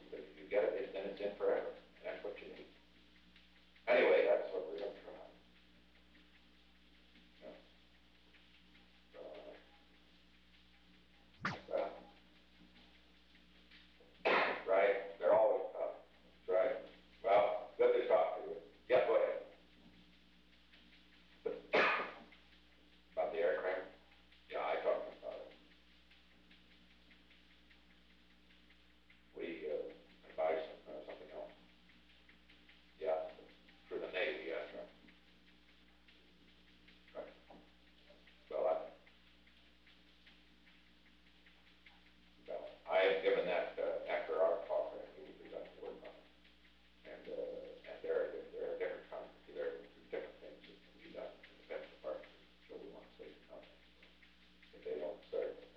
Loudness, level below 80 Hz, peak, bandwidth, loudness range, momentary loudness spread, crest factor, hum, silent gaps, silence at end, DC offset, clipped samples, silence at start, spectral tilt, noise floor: -39 LUFS; -74 dBFS; -20 dBFS; 6.8 kHz; 18 LU; 24 LU; 22 dB; 60 Hz at -70 dBFS; none; 0.1 s; under 0.1%; under 0.1%; 0 s; -5.5 dB/octave; -68 dBFS